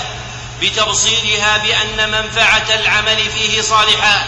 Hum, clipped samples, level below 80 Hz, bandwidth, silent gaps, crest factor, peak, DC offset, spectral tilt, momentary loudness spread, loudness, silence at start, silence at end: none; under 0.1%; -36 dBFS; 11.5 kHz; none; 12 dB; -2 dBFS; under 0.1%; -1 dB/octave; 6 LU; -12 LUFS; 0 s; 0 s